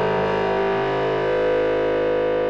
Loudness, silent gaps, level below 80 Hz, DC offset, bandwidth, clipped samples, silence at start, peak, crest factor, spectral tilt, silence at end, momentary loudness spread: -21 LUFS; none; -44 dBFS; under 0.1%; 7.4 kHz; under 0.1%; 0 s; -12 dBFS; 8 dB; -7 dB/octave; 0 s; 1 LU